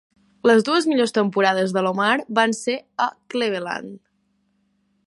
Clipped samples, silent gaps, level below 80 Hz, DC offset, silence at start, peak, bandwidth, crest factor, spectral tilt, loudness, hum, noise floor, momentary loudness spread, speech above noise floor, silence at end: under 0.1%; none; -72 dBFS; under 0.1%; 0.45 s; -2 dBFS; 11.5 kHz; 18 dB; -4.5 dB/octave; -20 LUFS; none; -68 dBFS; 9 LU; 47 dB; 1.1 s